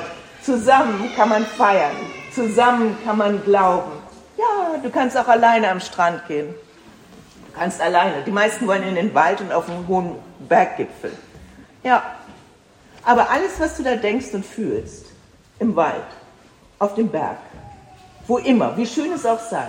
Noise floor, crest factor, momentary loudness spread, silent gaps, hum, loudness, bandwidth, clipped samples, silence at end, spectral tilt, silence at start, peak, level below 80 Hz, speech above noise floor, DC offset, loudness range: -50 dBFS; 18 dB; 16 LU; none; none; -19 LUFS; 16 kHz; under 0.1%; 0 s; -5 dB/octave; 0 s; -2 dBFS; -52 dBFS; 31 dB; under 0.1%; 6 LU